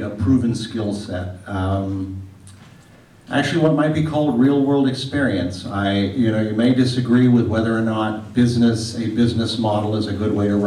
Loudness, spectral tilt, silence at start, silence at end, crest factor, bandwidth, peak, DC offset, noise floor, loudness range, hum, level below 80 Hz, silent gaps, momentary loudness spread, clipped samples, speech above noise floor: -19 LUFS; -7 dB/octave; 0 s; 0 s; 12 dB; 11.5 kHz; -6 dBFS; under 0.1%; -47 dBFS; 6 LU; none; -50 dBFS; none; 9 LU; under 0.1%; 29 dB